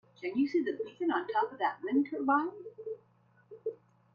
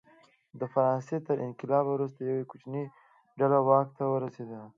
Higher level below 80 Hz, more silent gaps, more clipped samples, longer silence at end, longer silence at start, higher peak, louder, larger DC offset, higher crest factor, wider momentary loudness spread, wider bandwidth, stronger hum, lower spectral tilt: about the same, -82 dBFS vs -82 dBFS; neither; neither; first, 0.4 s vs 0.05 s; second, 0.2 s vs 0.55 s; second, -16 dBFS vs -8 dBFS; second, -33 LUFS vs -29 LUFS; neither; second, 16 dB vs 22 dB; about the same, 14 LU vs 13 LU; second, 6.6 kHz vs 7.4 kHz; neither; second, -6.5 dB/octave vs -10 dB/octave